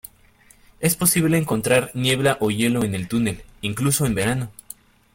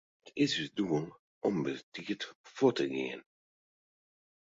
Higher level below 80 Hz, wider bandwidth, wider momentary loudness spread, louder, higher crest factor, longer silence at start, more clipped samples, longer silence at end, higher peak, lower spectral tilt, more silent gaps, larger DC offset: first, -48 dBFS vs -74 dBFS; first, 17 kHz vs 7.8 kHz; about the same, 12 LU vs 13 LU; first, -21 LUFS vs -34 LUFS; about the same, 20 dB vs 22 dB; first, 0.8 s vs 0.25 s; neither; second, 0.65 s vs 1.2 s; first, -2 dBFS vs -14 dBFS; about the same, -4.5 dB/octave vs -5.5 dB/octave; second, none vs 1.19-1.42 s, 1.83-1.92 s, 2.35-2.44 s; neither